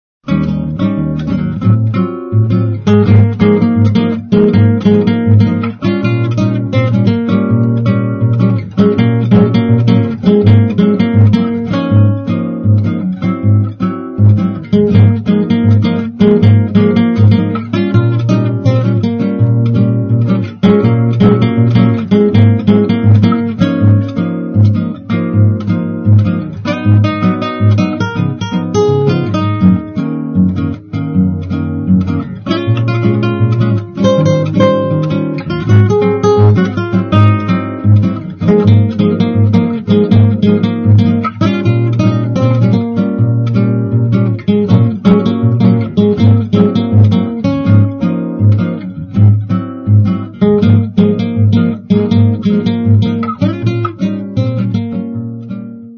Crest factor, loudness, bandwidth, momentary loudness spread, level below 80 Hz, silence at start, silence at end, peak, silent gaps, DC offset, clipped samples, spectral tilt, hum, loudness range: 10 dB; -11 LUFS; 6.6 kHz; 7 LU; -40 dBFS; 0.25 s; 0 s; 0 dBFS; none; under 0.1%; 0.4%; -9.5 dB/octave; none; 3 LU